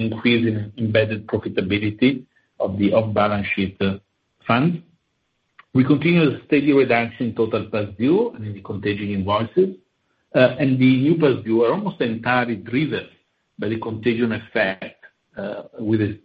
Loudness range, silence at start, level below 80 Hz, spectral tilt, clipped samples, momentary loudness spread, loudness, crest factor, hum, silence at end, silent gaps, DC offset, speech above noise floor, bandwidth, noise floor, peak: 4 LU; 0 s; -50 dBFS; -10 dB/octave; under 0.1%; 13 LU; -20 LUFS; 20 dB; none; 0.05 s; none; under 0.1%; 51 dB; 5.2 kHz; -71 dBFS; 0 dBFS